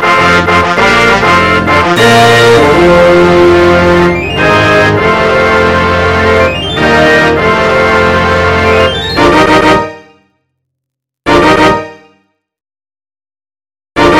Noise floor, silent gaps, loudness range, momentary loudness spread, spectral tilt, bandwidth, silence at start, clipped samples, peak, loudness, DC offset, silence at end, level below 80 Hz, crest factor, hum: -76 dBFS; none; 8 LU; 5 LU; -5 dB/octave; 16 kHz; 0 s; 0.8%; 0 dBFS; -6 LUFS; under 0.1%; 0 s; -28 dBFS; 8 dB; 50 Hz at -40 dBFS